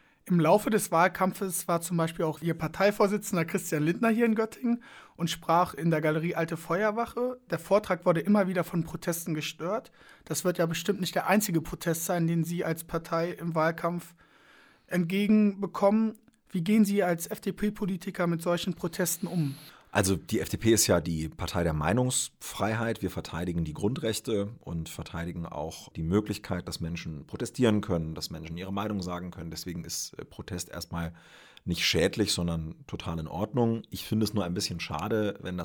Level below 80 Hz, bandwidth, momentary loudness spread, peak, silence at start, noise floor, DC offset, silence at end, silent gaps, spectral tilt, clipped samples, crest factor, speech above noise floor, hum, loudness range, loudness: -52 dBFS; over 20 kHz; 12 LU; -8 dBFS; 0.25 s; -59 dBFS; under 0.1%; 0 s; none; -5 dB/octave; under 0.1%; 20 dB; 30 dB; none; 5 LU; -29 LUFS